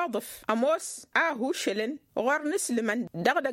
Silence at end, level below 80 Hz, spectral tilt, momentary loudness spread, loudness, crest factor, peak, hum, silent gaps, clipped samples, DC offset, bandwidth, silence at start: 0 s; -72 dBFS; -3.5 dB/octave; 6 LU; -28 LUFS; 20 dB; -10 dBFS; none; none; under 0.1%; under 0.1%; 16.5 kHz; 0 s